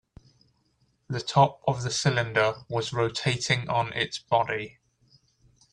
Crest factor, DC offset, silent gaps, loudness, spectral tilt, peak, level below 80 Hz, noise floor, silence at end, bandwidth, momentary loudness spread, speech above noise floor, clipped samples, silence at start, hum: 22 dB; under 0.1%; none; -26 LUFS; -4.5 dB/octave; -6 dBFS; -60 dBFS; -69 dBFS; 1.05 s; 10.5 kHz; 9 LU; 43 dB; under 0.1%; 1.1 s; none